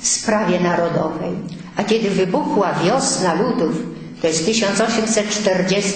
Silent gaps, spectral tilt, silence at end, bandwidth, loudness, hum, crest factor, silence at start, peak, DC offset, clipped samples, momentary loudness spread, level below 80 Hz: none; -4 dB/octave; 0 s; 9.2 kHz; -18 LUFS; none; 14 dB; 0 s; -4 dBFS; under 0.1%; under 0.1%; 8 LU; -52 dBFS